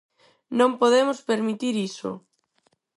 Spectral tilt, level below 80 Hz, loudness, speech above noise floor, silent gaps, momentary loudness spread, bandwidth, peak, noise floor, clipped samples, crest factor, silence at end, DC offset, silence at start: -4.5 dB/octave; -74 dBFS; -23 LUFS; 46 dB; none; 15 LU; 11.5 kHz; -6 dBFS; -69 dBFS; under 0.1%; 18 dB; 0.8 s; under 0.1%; 0.5 s